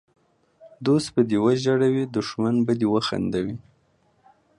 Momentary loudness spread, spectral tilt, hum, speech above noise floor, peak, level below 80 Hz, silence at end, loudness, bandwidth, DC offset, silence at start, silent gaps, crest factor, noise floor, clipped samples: 8 LU; -6.5 dB/octave; none; 42 dB; -8 dBFS; -58 dBFS; 1 s; -23 LUFS; 11.5 kHz; under 0.1%; 0.6 s; none; 16 dB; -64 dBFS; under 0.1%